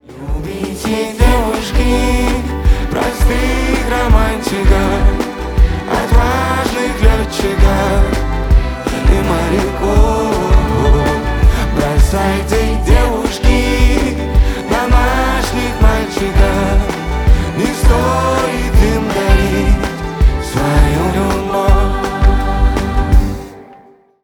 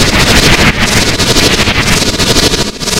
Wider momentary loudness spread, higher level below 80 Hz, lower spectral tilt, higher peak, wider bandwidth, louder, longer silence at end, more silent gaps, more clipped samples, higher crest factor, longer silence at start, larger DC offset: about the same, 4 LU vs 3 LU; about the same, -14 dBFS vs -18 dBFS; first, -6 dB/octave vs -3 dB/octave; about the same, 0 dBFS vs 0 dBFS; second, 16.5 kHz vs over 20 kHz; second, -14 LUFS vs -7 LUFS; first, 0.5 s vs 0 s; neither; second, under 0.1% vs 2%; about the same, 12 dB vs 8 dB; about the same, 0.1 s vs 0 s; second, under 0.1% vs 3%